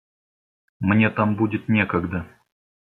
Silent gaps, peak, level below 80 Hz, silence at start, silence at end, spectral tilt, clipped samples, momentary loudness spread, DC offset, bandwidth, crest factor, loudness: none; -4 dBFS; -58 dBFS; 0.8 s; 0.75 s; -9.5 dB/octave; under 0.1%; 10 LU; under 0.1%; 4.3 kHz; 18 dB; -22 LUFS